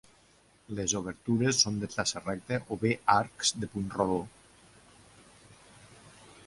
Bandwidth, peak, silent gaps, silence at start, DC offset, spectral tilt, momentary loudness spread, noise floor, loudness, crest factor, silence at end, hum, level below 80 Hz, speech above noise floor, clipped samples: 11.5 kHz; -8 dBFS; none; 0.7 s; under 0.1%; -3.5 dB/octave; 9 LU; -63 dBFS; -30 LUFS; 24 dB; 0.4 s; none; -60 dBFS; 33 dB; under 0.1%